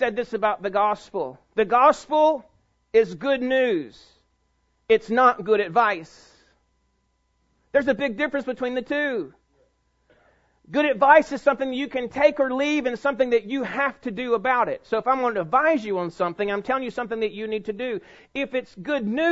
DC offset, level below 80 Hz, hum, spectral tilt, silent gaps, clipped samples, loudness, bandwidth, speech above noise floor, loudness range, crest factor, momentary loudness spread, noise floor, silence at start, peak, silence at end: under 0.1%; -60 dBFS; none; -5.5 dB/octave; none; under 0.1%; -23 LUFS; 8 kHz; 47 dB; 6 LU; 20 dB; 11 LU; -69 dBFS; 0 s; -2 dBFS; 0 s